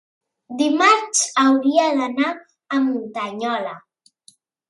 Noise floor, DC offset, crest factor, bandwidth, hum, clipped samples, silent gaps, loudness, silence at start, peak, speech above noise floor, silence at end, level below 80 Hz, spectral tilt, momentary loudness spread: -55 dBFS; under 0.1%; 18 dB; 11.5 kHz; none; under 0.1%; none; -19 LUFS; 0.5 s; -2 dBFS; 37 dB; 0.9 s; -76 dBFS; -1.5 dB/octave; 12 LU